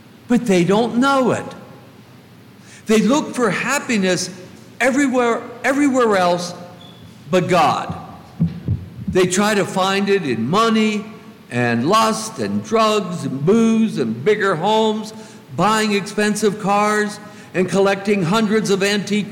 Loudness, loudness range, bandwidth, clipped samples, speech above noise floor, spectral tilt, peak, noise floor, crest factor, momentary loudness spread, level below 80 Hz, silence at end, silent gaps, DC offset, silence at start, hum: -18 LUFS; 2 LU; 17 kHz; under 0.1%; 27 dB; -5 dB/octave; -4 dBFS; -43 dBFS; 14 dB; 11 LU; -52 dBFS; 0 s; none; under 0.1%; 0.3 s; none